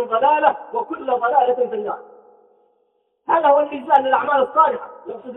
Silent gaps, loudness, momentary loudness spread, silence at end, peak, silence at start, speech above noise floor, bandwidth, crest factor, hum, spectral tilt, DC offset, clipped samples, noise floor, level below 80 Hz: none; -18 LUFS; 14 LU; 0 s; -2 dBFS; 0 s; 48 dB; 4 kHz; 18 dB; none; -6.5 dB/octave; under 0.1%; under 0.1%; -66 dBFS; -68 dBFS